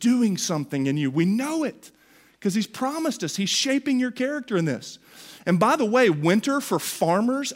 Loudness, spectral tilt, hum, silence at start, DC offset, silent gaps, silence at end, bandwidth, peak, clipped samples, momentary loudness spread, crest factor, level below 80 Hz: -23 LUFS; -4.5 dB/octave; none; 0 s; under 0.1%; none; 0 s; 16 kHz; -6 dBFS; under 0.1%; 9 LU; 18 dB; -72 dBFS